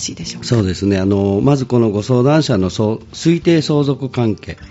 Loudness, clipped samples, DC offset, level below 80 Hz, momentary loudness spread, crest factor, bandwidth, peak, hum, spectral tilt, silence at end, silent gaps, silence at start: -15 LUFS; under 0.1%; under 0.1%; -44 dBFS; 6 LU; 14 dB; 8.2 kHz; -2 dBFS; none; -6.5 dB/octave; 0.05 s; none; 0 s